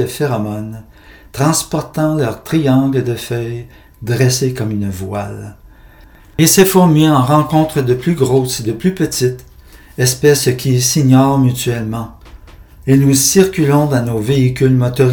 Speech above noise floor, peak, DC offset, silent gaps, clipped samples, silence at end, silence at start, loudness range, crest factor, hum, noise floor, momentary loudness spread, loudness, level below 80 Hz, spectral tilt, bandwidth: 28 dB; 0 dBFS; under 0.1%; none; under 0.1%; 0 s; 0 s; 4 LU; 14 dB; none; -41 dBFS; 16 LU; -13 LUFS; -40 dBFS; -5.5 dB/octave; over 20 kHz